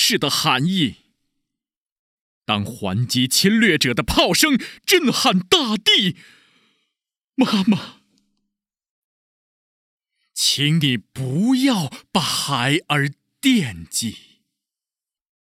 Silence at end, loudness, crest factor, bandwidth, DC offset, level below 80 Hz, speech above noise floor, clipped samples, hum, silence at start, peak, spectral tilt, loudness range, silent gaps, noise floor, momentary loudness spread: 1.35 s; -18 LUFS; 20 dB; 17 kHz; under 0.1%; -48 dBFS; over 71 dB; under 0.1%; none; 0 s; 0 dBFS; -3.5 dB/octave; 9 LU; 1.81-1.85 s, 1.92-2.41 s, 8.89-9.97 s; under -90 dBFS; 9 LU